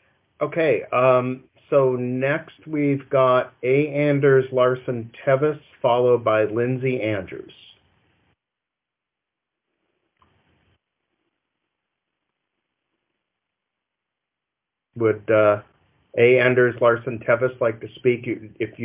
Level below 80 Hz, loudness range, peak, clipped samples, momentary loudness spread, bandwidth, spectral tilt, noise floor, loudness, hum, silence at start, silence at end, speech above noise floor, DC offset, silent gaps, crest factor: -64 dBFS; 8 LU; -4 dBFS; under 0.1%; 11 LU; 3.8 kHz; -10.5 dB/octave; -85 dBFS; -21 LUFS; none; 0.4 s; 0 s; 65 dB; under 0.1%; none; 20 dB